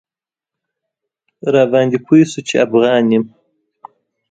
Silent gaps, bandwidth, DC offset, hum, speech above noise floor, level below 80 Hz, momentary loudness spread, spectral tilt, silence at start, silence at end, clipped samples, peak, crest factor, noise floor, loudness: none; 9.2 kHz; under 0.1%; none; 76 dB; -60 dBFS; 6 LU; -6 dB/octave; 1.45 s; 1.05 s; under 0.1%; 0 dBFS; 16 dB; -88 dBFS; -14 LUFS